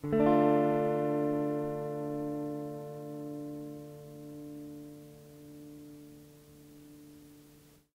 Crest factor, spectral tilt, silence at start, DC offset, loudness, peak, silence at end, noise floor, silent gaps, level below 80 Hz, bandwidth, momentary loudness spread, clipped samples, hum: 20 dB; -8.5 dB/octave; 0.05 s; under 0.1%; -32 LUFS; -14 dBFS; 0.6 s; -59 dBFS; none; -68 dBFS; 16 kHz; 27 LU; under 0.1%; none